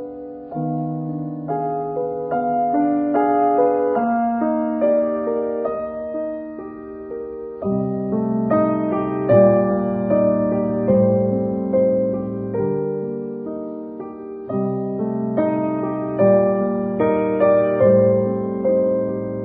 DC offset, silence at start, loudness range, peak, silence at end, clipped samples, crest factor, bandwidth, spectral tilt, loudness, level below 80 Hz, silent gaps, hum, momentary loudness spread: under 0.1%; 0 s; 7 LU; -2 dBFS; 0 s; under 0.1%; 18 dB; 3.8 kHz; -14 dB/octave; -20 LUFS; -52 dBFS; none; none; 14 LU